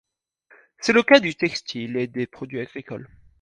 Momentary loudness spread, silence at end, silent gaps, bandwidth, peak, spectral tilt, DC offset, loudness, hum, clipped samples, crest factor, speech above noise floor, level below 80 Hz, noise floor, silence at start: 19 LU; 0.35 s; none; 10 kHz; 0 dBFS; -4.5 dB/octave; under 0.1%; -21 LUFS; none; under 0.1%; 22 dB; 37 dB; -62 dBFS; -59 dBFS; 0.8 s